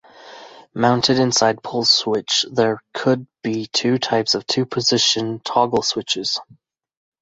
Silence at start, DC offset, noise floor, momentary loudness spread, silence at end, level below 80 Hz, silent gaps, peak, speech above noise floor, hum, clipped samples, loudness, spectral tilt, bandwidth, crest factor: 0.2 s; under 0.1%; -41 dBFS; 7 LU; 0.8 s; -58 dBFS; none; -2 dBFS; 22 dB; none; under 0.1%; -18 LUFS; -3.5 dB/octave; 8.2 kHz; 18 dB